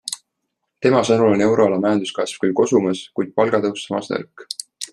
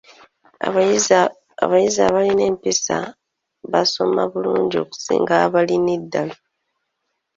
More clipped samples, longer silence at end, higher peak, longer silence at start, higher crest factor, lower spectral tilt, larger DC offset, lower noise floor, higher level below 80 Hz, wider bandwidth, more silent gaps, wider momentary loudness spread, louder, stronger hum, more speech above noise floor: neither; second, 0.05 s vs 1 s; about the same, -2 dBFS vs -2 dBFS; second, 0.05 s vs 0.6 s; about the same, 18 dB vs 18 dB; first, -5 dB/octave vs -3.5 dB/octave; neither; about the same, -76 dBFS vs -75 dBFS; about the same, -62 dBFS vs -58 dBFS; first, 12.5 kHz vs 7.8 kHz; neither; first, 14 LU vs 9 LU; about the same, -19 LUFS vs -18 LUFS; neither; about the same, 58 dB vs 57 dB